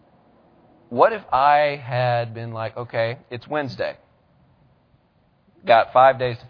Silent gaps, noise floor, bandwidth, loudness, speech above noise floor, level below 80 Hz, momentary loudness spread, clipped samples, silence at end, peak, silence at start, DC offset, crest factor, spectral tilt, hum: none; -61 dBFS; 5.4 kHz; -20 LUFS; 41 dB; -60 dBFS; 14 LU; under 0.1%; 0 s; -2 dBFS; 0.9 s; under 0.1%; 20 dB; -8 dB/octave; none